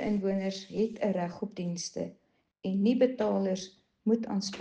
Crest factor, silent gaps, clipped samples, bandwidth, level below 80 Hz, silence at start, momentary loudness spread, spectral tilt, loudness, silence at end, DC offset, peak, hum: 18 dB; none; under 0.1%; 8.8 kHz; -68 dBFS; 0 s; 10 LU; -6 dB/octave; -31 LUFS; 0 s; under 0.1%; -14 dBFS; none